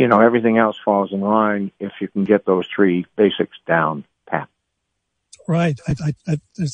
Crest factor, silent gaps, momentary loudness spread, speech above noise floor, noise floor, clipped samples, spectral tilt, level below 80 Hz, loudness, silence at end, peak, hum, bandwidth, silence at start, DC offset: 18 dB; none; 11 LU; 57 dB; -75 dBFS; under 0.1%; -7.5 dB/octave; -54 dBFS; -19 LUFS; 0 s; 0 dBFS; none; 9.6 kHz; 0 s; under 0.1%